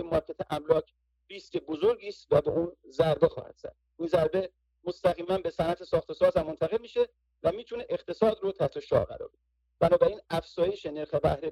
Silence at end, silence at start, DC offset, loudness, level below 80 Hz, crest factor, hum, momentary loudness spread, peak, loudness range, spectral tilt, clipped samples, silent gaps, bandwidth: 0 s; 0 s; under 0.1%; -29 LUFS; -54 dBFS; 22 dB; none; 13 LU; -8 dBFS; 1 LU; -7 dB/octave; under 0.1%; none; 12 kHz